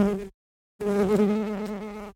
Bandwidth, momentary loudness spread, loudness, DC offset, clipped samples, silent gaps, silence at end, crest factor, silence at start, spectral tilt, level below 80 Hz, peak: 16 kHz; 12 LU; -26 LUFS; under 0.1%; under 0.1%; 0.34-0.79 s; 0.05 s; 16 dB; 0 s; -7.5 dB/octave; -52 dBFS; -10 dBFS